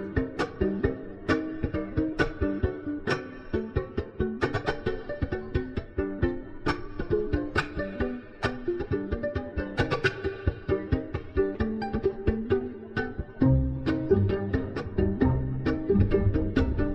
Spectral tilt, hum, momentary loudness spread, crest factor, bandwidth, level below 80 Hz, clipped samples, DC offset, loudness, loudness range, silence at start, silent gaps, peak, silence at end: -8 dB/octave; none; 8 LU; 18 dB; 9 kHz; -36 dBFS; under 0.1%; under 0.1%; -29 LUFS; 5 LU; 0 s; none; -10 dBFS; 0 s